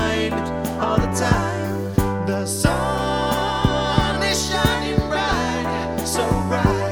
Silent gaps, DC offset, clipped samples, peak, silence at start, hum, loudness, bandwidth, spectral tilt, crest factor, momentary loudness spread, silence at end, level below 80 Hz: none; under 0.1%; under 0.1%; -2 dBFS; 0 s; none; -21 LUFS; over 20 kHz; -5 dB/octave; 20 dB; 4 LU; 0 s; -32 dBFS